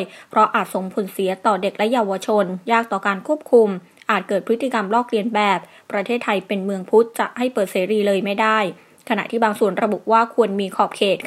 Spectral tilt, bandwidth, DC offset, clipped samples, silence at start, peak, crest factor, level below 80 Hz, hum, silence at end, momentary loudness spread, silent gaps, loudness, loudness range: -5 dB/octave; 15 kHz; under 0.1%; under 0.1%; 0 s; 0 dBFS; 18 dB; -74 dBFS; none; 0 s; 7 LU; none; -20 LUFS; 1 LU